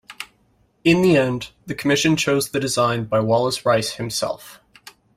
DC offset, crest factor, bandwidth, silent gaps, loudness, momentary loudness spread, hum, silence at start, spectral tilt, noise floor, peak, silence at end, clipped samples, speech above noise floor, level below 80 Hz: under 0.1%; 18 dB; 16 kHz; none; -19 LUFS; 14 LU; none; 0.1 s; -4.5 dB/octave; -61 dBFS; -4 dBFS; 0.65 s; under 0.1%; 42 dB; -54 dBFS